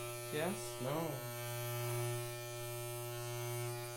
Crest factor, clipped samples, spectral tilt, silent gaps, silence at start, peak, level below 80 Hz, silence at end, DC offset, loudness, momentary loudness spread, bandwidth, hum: 16 dB; under 0.1%; -4.5 dB/octave; none; 0 s; -26 dBFS; -68 dBFS; 0 s; under 0.1%; -41 LUFS; 4 LU; 17 kHz; none